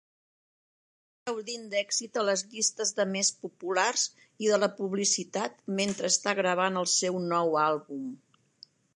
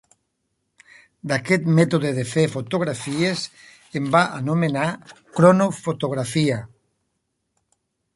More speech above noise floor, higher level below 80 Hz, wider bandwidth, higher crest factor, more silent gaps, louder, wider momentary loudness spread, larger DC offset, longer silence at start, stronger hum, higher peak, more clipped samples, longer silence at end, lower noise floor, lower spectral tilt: second, 29 dB vs 54 dB; second, -80 dBFS vs -60 dBFS; about the same, 11.5 kHz vs 11.5 kHz; about the same, 20 dB vs 20 dB; neither; second, -28 LUFS vs -21 LUFS; second, 10 LU vs 13 LU; neither; about the same, 1.25 s vs 1.25 s; neither; second, -10 dBFS vs -2 dBFS; neither; second, 0.8 s vs 1.5 s; second, -58 dBFS vs -75 dBFS; second, -2.5 dB/octave vs -6 dB/octave